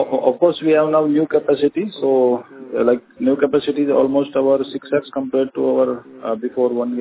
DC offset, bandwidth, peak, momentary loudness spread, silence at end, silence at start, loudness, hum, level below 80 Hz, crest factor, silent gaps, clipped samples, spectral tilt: under 0.1%; 4 kHz; -2 dBFS; 6 LU; 0 s; 0 s; -18 LUFS; none; -62 dBFS; 16 dB; none; under 0.1%; -10.5 dB/octave